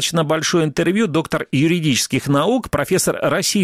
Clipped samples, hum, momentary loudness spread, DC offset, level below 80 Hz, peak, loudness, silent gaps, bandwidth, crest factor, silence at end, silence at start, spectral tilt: under 0.1%; none; 2 LU; under 0.1%; -46 dBFS; -4 dBFS; -18 LUFS; none; 16 kHz; 14 dB; 0 s; 0 s; -4.5 dB/octave